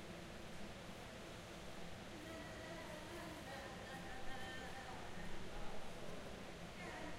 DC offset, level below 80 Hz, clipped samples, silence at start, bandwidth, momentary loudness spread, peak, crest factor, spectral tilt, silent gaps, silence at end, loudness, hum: under 0.1%; -58 dBFS; under 0.1%; 0 s; 16 kHz; 3 LU; -34 dBFS; 16 dB; -4 dB/octave; none; 0 s; -52 LUFS; none